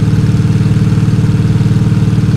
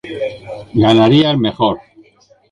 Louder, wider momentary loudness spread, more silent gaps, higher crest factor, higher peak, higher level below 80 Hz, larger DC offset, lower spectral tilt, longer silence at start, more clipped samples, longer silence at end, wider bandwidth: about the same, -11 LUFS vs -13 LUFS; second, 0 LU vs 15 LU; neither; second, 8 dB vs 14 dB; about the same, 0 dBFS vs -2 dBFS; first, -28 dBFS vs -44 dBFS; neither; about the same, -8 dB/octave vs -7.5 dB/octave; about the same, 0 s vs 0.05 s; neither; second, 0 s vs 0.75 s; about the same, 11 kHz vs 10 kHz